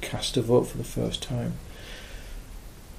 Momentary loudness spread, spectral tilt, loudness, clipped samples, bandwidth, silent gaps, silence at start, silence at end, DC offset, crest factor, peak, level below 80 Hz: 21 LU; -5 dB/octave; -27 LUFS; under 0.1%; 15.5 kHz; none; 0 s; 0 s; under 0.1%; 20 dB; -10 dBFS; -42 dBFS